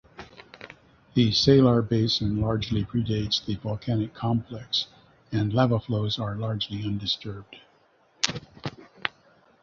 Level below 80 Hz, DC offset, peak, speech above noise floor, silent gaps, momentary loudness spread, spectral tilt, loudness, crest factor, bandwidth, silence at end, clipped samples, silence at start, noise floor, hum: -50 dBFS; under 0.1%; 0 dBFS; 37 dB; none; 18 LU; -6 dB/octave; -26 LUFS; 26 dB; 7.6 kHz; 0.55 s; under 0.1%; 0.2 s; -62 dBFS; none